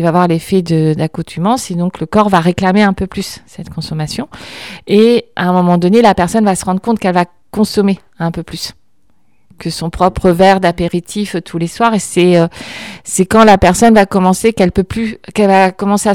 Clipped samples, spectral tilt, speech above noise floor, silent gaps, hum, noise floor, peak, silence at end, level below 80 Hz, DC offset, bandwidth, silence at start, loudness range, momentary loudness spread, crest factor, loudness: 0.4%; -5.5 dB/octave; 48 dB; none; none; -60 dBFS; 0 dBFS; 0 s; -36 dBFS; 0.4%; 16 kHz; 0 s; 5 LU; 15 LU; 12 dB; -12 LUFS